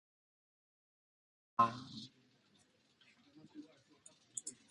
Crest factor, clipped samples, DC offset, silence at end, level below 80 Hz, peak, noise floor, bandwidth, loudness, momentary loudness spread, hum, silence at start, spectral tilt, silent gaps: 30 dB; under 0.1%; under 0.1%; 0.15 s; -84 dBFS; -16 dBFS; -73 dBFS; 11 kHz; -39 LUFS; 23 LU; none; 1.6 s; -3.5 dB/octave; none